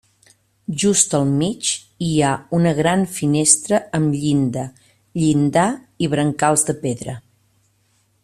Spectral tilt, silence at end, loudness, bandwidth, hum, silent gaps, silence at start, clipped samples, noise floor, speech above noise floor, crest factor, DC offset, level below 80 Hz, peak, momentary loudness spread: -4.5 dB/octave; 1.05 s; -18 LUFS; 13.5 kHz; none; none; 0.7 s; under 0.1%; -62 dBFS; 44 dB; 20 dB; under 0.1%; -54 dBFS; 0 dBFS; 13 LU